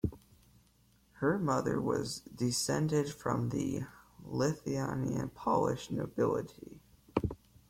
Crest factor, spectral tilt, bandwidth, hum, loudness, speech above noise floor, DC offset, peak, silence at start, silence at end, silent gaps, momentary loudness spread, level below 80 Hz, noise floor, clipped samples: 20 dB; -5.5 dB/octave; 16.5 kHz; none; -34 LUFS; 34 dB; under 0.1%; -14 dBFS; 0.05 s; 0.35 s; none; 10 LU; -58 dBFS; -67 dBFS; under 0.1%